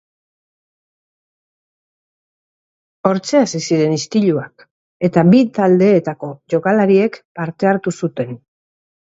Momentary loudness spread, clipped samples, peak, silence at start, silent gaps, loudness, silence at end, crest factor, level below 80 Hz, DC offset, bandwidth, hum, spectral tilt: 14 LU; under 0.1%; 0 dBFS; 3.05 s; 4.71-5.00 s, 7.25-7.35 s; -15 LUFS; 0.65 s; 18 dB; -62 dBFS; under 0.1%; 8 kHz; none; -6.5 dB/octave